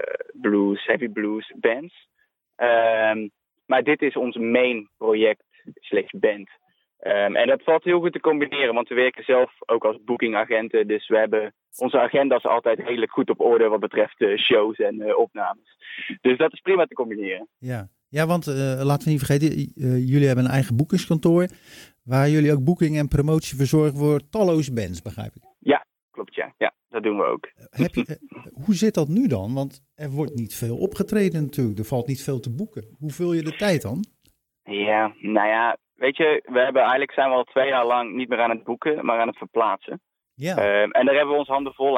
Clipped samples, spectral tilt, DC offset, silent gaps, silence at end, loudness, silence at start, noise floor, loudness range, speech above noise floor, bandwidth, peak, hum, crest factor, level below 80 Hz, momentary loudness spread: under 0.1%; -6.5 dB/octave; under 0.1%; 26.03-26.09 s; 0 s; -22 LUFS; 0 s; -65 dBFS; 5 LU; 44 dB; 17.5 kHz; -4 dBFS; none; 18 dB; -52 dBFS; 12 LU